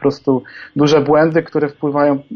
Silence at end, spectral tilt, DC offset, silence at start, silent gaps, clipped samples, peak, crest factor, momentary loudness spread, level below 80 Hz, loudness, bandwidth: 0 s; -7 dB/octave; under 0.1%; 0 s; none; under 0.1%; -2 dBFS; 12 dB; 8 LU; -52 dBFS; -15 LUFS; 6.8 kHz